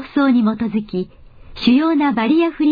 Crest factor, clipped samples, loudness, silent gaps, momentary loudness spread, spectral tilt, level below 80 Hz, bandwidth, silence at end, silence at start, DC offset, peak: 14 dB; under 0.1%; -17 LUFS; none; 11 LU; -8 dB/octave; -46 dBFS; 5 kHz; 0 s; 0 s; under 0.1%; -4 dBFS